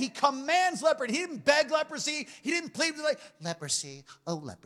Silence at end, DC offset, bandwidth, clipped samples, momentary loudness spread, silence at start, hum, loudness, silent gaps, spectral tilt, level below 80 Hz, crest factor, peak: 0.1 s; under 0.1%; 14.5 kHz; under 0.1%; 12 LU; 0 s; none; -29 LUFS; none; -2.5 dB/octave; -76 dBFS; 20 dB; -10 dBFS